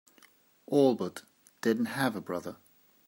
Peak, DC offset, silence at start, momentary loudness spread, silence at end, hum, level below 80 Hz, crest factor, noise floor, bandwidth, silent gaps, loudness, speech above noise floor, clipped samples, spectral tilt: -12 dBFS; under 0.1%; 0.7 s; 14 LU; 0.55 s; none; -80 dBFS; 20 dB; -62 dBFS; 16 kHz; none; -30 LUFS; 33 dB; under 0.1%; -6 dB/octave